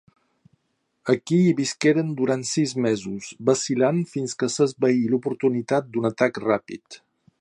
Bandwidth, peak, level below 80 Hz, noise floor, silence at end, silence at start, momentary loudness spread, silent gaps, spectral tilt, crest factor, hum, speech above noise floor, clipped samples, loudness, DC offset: 11.5 kHz; -4 dBFS; -68 dBFS; -73 dBFS; 0.45 s; 1.05 s; 6 LU; none; -5.5 dB/octave; 20 dB; none; 51 dB; under 0.1%; -23 LUFS; under 0.1%